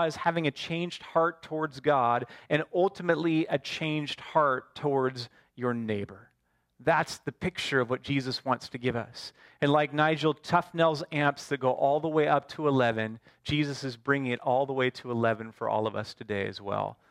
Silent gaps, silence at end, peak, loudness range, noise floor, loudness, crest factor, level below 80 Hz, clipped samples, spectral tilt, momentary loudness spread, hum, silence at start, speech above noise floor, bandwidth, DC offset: none; 0.15 s; -8 dBFS; 4 LU; -74 dBFS; -29 LUFS; 20 dB; -64 dBFS; under 0.1%; -6 dB/octave; 8 LU; none; 0 s; 45 dB; 14.5 kHz; under 0.1%